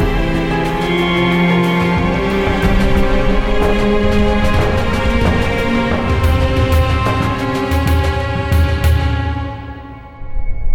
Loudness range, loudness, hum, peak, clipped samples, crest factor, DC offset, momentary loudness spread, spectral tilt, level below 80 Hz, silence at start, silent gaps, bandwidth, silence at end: 2 LU; -15 LUFS; none; -2 dBFS; under 0.1%; 12 dB; under 0.1%; 9 LU; -6.5 dB/octave; -20 dBFS; 0 s; none; 17 kHz; 0 s